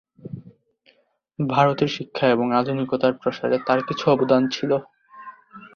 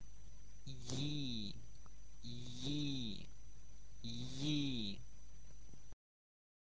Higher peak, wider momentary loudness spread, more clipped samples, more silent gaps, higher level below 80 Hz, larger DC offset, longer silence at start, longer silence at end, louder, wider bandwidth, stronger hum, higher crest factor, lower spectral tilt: first, -2 dBFS vs -26 dBFS; about the same, 22 LU vs 22 LU; neither; neither; about the same, -62 dBFS vs -60 dBFS; second, under 0.1% vs 0.7%; first, 0.25 s vs 0 s; second, 0.05 s vs 0.8 s; first, -21 LUFS vs -44 LUFS; second, 6.8 kHz vs 8 kHz; neither; about the same, 20 dB vs 20 dB; first, -6.5 dB/octave vs -5 dB/octave